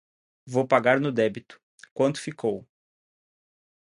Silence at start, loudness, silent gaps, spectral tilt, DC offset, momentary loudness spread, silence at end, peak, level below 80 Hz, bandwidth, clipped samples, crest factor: 0.45 s; -25 LUFS; 1.63-1.78 s, 1.91-1.96 s; -6 dB/octave; under 0.1%; 16 LU; 1.35 s; -4 dBFS; -70 dBFS; 11.5 kHz; under 0.1%; 24 dB